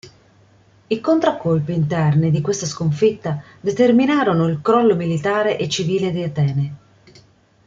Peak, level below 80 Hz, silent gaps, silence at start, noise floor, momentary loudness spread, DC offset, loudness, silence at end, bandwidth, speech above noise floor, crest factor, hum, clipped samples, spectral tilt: -2 dBFS; -54 dBFS; none; 0.05 s; -52 dBFS; 9 LU; under 0.1%; -18 LUFS; 0.9 s; 7.8 kHz; 35 dB; 16 dB; none; under 0.1%; -6.5 dB/octave